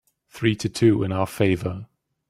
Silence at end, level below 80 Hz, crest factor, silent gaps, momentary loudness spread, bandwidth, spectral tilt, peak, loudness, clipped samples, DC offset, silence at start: 0.45 s; -54 dBFS; 18 dB; none; 9 LU; 15.5 kHz; -6.5 dB/octave; -6 dBFS; -23 LUFS; under 0.1%; under 0.1%; 0.35 s